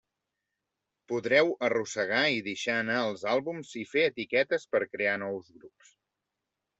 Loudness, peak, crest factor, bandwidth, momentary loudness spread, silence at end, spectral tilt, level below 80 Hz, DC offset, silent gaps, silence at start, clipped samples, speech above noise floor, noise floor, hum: -29 LUFS; -10 dBFS; 22 dB; 8.2 kHz; 10 LU; 1.1 s; -4 dB/octave; -76 dBFS; under 0.1%; none; 1.1 s; under 0.1%; 57 dB; -86 dBFS; none